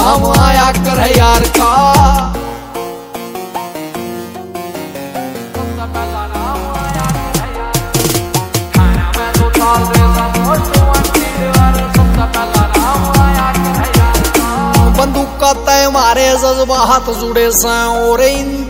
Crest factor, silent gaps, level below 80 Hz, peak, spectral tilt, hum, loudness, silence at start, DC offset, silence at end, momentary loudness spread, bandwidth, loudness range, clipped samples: 12 dB; none; -18 dBFS; 0 dBFS; -4.5 dB/octave; none; -11 LUFS; 0 s; under 0.1%; 0 s; 14 LU; 16.5 kHz; 10 LU; 0.3%